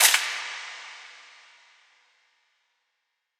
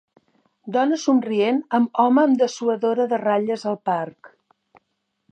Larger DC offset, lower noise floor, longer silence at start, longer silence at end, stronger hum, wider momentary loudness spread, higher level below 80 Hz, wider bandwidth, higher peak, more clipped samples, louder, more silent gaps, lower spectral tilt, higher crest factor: neither; first, -79 dBFS vs -75 dBFS; second, 0 s vs 0.65 s; first, 2.25 s vs 1.05 s; neither; first, 26 LU vs 8 LU; second, under -90 dBFS vs -78 dBFS; first, over 20 kHz vs 8.8 kHz; about the same, -2 dBFS vs -4 dBFS; neither; second, -26 LUFS vs -20 LUFS; neither; second, 6.5 dB/octave vs -5.5 dB/octave; first, 28 dB vs 16 dB